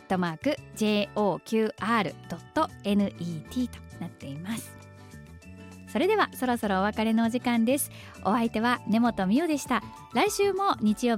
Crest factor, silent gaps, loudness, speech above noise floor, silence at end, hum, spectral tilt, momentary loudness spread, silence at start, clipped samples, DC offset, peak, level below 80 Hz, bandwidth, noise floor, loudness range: 16 dB; none; -27 LUFS; 20 dB; 0 s; none; -5 dB/octave; 16 LU; 0.1 s; under 0.1%; under 0.1%; -12 dBFS; -56 dBFS; 16.5 kHz; -47 dBFS; 6 LU